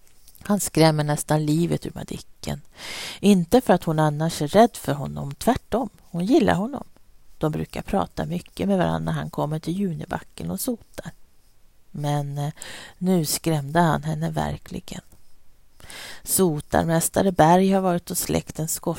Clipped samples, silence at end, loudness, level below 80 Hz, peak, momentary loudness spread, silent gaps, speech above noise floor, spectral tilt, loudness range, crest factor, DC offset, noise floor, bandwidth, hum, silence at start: under 0.1%; 0 s; -23 LUFS; -48 dBFS; -2 dBFS; 17 LU; none; 29 dB; -5.5 dB/octave; 6 LU; 22 dB; under 0.1%; -52 dBFS; 16.5 kHz; none; 0.25 s